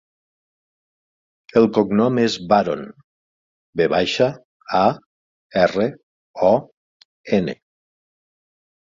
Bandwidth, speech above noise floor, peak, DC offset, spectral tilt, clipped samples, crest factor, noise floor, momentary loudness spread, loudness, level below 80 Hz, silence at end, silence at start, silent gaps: 7.6 kHz; over 72 dB; -2 dBFS; under 0.1%; -6 dB/octave; under 0.1%; 20 dB; under -90 dBFS; 14 LU; -19 LUFS; -56 dBFS; 1.25 s; 1.55 s; 3.04-3.73 s, 4.45-4.60 s, 5.06-5.50 s, 6.03-6.34 s, 6.77-7.24 s